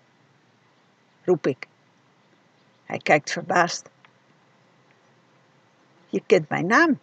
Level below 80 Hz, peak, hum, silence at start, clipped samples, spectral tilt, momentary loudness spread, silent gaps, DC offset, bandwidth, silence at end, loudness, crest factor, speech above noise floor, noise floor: -82 dBFS; -4 dBFS; none; 1.25 s; under 0.1%; -4.5 dB/octave; 14 LU; none; under 0.1%; 8.6 kHz; 0.05 s; -23 LUFS; 24 dB; 39 dB; -61 dBFS